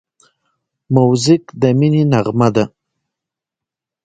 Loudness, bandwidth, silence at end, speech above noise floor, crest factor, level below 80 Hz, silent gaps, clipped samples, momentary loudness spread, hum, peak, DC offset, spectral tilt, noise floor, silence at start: -14 LUFS; 9.2 kHz; 1.4 s; 73 dB; 16 dB; -52 dBFS; none; under 0.1%; 5 LU; none; 0 dBFS; under 0.1%; -7 dB/octave; -85 dBFS; 0.9 s